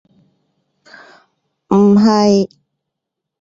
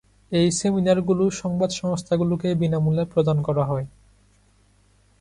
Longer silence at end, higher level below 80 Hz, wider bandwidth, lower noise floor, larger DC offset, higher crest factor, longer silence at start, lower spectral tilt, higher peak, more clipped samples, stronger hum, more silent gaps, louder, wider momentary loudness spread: second, 0.95 s vs 1.35 s; about the same, -56 dBFS vs -52 dBFS; second, 7.6 kHz vs 11 kHz; first, -80 dBFS vs -59 dBFS; neither; about the same, 16 dB vs 16 dB; first, 1.7 s vs 0.3 s; about the same, -7 dB/octave vs -6.5 dB/octave; first, 0 dBFS vs -8 dBFS; neither; second, none vs 50 Hz at -50 dBFS; neither; first, -12 LUFS vs -22 LUFS; about the same, 7 LU vs 6 LU